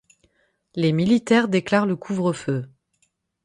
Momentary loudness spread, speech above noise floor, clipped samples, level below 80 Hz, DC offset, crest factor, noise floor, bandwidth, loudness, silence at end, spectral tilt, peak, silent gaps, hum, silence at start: 11 LU; 49 dB; under 0.1%; -62 dBFS; under 0.1%; 18 dB; -69 dBFS; 11.5 kHz; -21 LUFS; 0.8 s; -6.5 dB/octave; -4 dBFS; none; none; 0.75 s